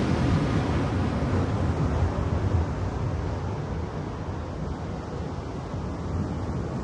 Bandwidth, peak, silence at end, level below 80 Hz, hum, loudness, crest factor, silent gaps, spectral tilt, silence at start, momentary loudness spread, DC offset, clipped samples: 9.8 kHz; -12 dBFS; 0 s; -36 dBFS; none; -28 LUFS; 14 dB; none; -7.5 dB/octave; 0 s; 9 LU; under 0.1%; under 0.1%